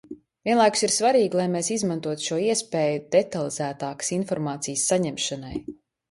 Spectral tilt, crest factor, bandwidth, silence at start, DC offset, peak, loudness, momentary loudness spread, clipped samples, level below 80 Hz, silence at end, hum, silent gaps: -3.5 dB/octave; 18 dB; 11.5 kHz; 0.1 s; under 0.1%; -6 dBFS; -24 LUFS; 10 LU; under 0.1%; -60 dBFS; 0.4 s; none; none